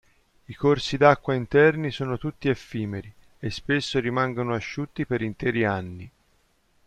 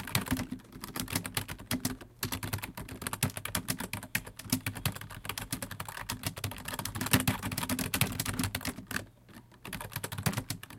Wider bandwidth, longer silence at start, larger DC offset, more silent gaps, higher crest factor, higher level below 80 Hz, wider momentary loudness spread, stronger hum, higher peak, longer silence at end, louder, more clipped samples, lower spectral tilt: second, 9.4 kHz vs 17 kHz; first, 0.5 s vs 0 s; neither; neither; second, 22 dB vs 30 dB; about the same, -52 dBFS vs -52 dBFS; first, 14 LU vs 10 LU; neither; first, -2 dBFS vs -6 dBFS; first, 0.8 s vs 0 s; first, -24 LUFS vs -35 LUFS; neither; first, -6.5 dB/octave vs -3.5 dB/octave